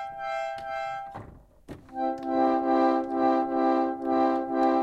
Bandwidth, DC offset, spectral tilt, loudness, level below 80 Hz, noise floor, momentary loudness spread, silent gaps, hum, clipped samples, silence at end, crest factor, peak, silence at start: 7.8 kHz; under 0.1%; -6.5 dB/octave; -26 LUFS; -60 dBFS; -48 dBFS; 16 LU; none; none; under 0.1%; 0 s; 14 dB; -12 dBFS; 0 s